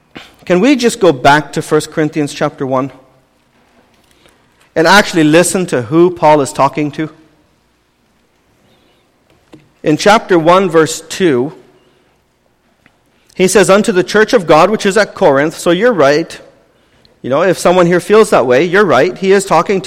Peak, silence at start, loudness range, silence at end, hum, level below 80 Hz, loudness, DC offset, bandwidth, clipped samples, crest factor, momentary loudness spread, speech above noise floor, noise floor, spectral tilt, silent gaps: 0 dBFS; 0.15 s; 6 LU; 0 s; none; -48 dBFS; -10 LUFS; under 0.1%; 16 kHz; under 0.1%; 12 dB; 9 LU; 46 dB; -56 dBFS; -4.5 dB/octave; none